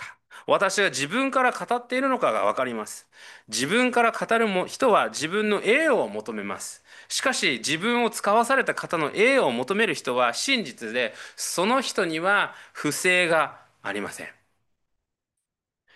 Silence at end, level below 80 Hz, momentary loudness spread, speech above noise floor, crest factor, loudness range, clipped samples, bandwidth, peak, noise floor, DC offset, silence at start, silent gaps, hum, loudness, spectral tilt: 1.65 s; -74 dBFS; 12 LU; 60 dB; 18 dB; 2 LU; under 0.1%; 12.5 kHz; -6 dBFS; -84 dBFS; under 0.1%; 0 s; none; none; -23 LUFS; -3 dB/octave